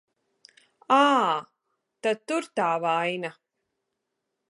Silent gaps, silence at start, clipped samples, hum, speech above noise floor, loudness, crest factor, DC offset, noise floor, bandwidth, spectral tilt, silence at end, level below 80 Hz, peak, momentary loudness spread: none; 0.9 s; under 0.1%; none; 57 dB; -25 LUFS; 20 dB; under 0.1%; -82 dBFS; 11.5 kHz; -4 dB/octave; 1.2 s; -84 dBFS; -8 dBFS; 11 LU